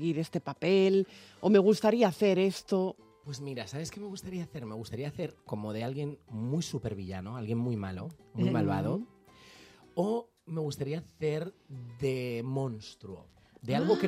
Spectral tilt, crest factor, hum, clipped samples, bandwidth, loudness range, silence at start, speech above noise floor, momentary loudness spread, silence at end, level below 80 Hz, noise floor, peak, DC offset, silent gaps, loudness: -6.5 dB/octave; 20 dB; none; under 0.1%; 15 kHz; 10 LU; 0 s; 25 dB; 17 LU; 0 s; -68 dBFS; -56 dBFS; -10 dBFS; under 0.1%; none; -32 LUFS